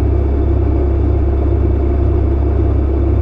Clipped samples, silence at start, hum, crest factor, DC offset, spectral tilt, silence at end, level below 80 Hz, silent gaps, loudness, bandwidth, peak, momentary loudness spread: under 0.1%; 0 s; none; 10 dB; under 0.1%; -11.5 dB/octave; 0 s; -14 dBFS; none; -15 LUFS; 3.6 kHz; -4 dBFS; 0 LU